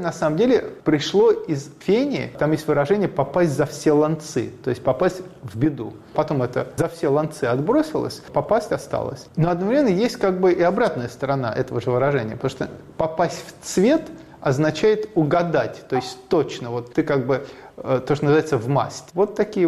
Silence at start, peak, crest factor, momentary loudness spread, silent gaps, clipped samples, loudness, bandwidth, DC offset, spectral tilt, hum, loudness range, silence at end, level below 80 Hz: 0 s; -8 dBFS; 14 dB; 9 LU; none; under 0.1%; -21 LUFS; 13.5 kHz; under 0.1%; -6.5 dB/octave; none; 3 LU; 0 s; -52 dBFS